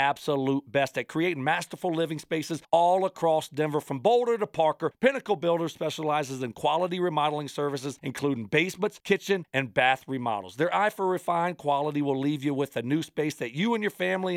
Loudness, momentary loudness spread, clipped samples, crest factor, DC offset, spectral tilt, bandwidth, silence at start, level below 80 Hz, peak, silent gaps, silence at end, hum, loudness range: -27 LUFS; 7 LU; under 0.1%; 18 dB; under 0.1%; -5.5 dB/octave; 16 kHz; 0 s; -72 dBFS; -8 dBFS; none; 0 s; none; 2 LU